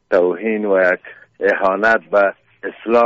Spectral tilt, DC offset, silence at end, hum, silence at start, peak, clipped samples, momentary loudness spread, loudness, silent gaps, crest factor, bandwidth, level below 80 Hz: -3.5 dB/octave; under 0.1%; 0 s; none; 0.1 s; -4 dBFS; under 0.1%; 11 LU; -16 LUFS; none; 14 dB; 7.6 kHz; -60 dBFS